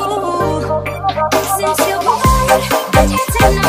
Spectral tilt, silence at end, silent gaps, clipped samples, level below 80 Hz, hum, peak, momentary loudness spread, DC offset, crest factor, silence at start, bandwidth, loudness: -4.5 dB/octave; 0 s; none; under 0.1%; -24 dBFS; 50 Hz at -40 dBFS; 0 dBFS; 5 LU; under 0.1%; 14 dB; 0 s; 15.5 kHz; -14 LUFS